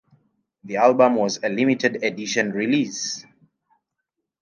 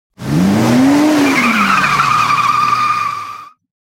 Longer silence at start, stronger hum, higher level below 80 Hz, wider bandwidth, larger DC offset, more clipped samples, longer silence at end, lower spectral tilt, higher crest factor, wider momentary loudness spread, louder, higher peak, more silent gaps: first, 0.65 s vs 0.2 s; neither; second, -74 dBFS vs -46 dBFS; second, 10 kHz vs 17 kHz; neither; neither; first, 1.2 s vs 0.35 s; about the same, -4 dB/octave vs -5 dB/octave; first, 20 dB vs 12 dB; about the same, 11 LU vs 9 LU; second, -21 LUFS vs -12 LUFS; second, -4 dBFS vs 0 dBFS; neither